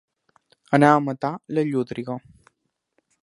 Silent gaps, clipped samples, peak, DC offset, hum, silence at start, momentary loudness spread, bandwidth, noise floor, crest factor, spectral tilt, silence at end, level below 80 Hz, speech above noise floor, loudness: none; under 0.1%; 0 dBFS; under 0.1%; none; 0.7 s; 15 LU; 11.5 kHz; -75 dBFS; 24 dB; -7.5 dB/octave; 1.05 s; -66 dBFS; 54 dB; -22 LUFS